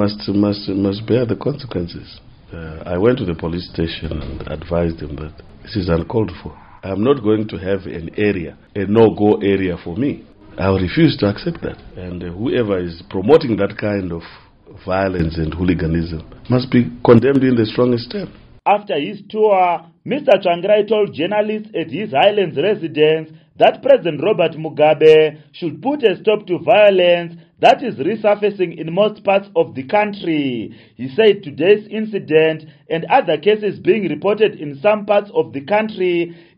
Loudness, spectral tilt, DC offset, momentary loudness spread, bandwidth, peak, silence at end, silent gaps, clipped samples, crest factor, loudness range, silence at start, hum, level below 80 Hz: -17 LUFS; -5 dB/octave; under 0.1%; 14 LU; 6.6 kHz; 0 dBFS; 0.25 s; none; under 0.1%; 16 dB; 7 LU; 0 s; none; -42 dBFS